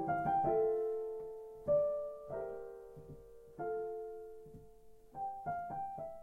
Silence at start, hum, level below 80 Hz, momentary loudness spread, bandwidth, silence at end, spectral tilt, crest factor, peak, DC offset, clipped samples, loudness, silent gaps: 0 s; none; -66 dBFS; 21 LU; 10.5 kHz; 0 s; -9 dB/octave; 16 dB; -24 dBFS; under 0.1%; under 0.1%; -38 LUFS; none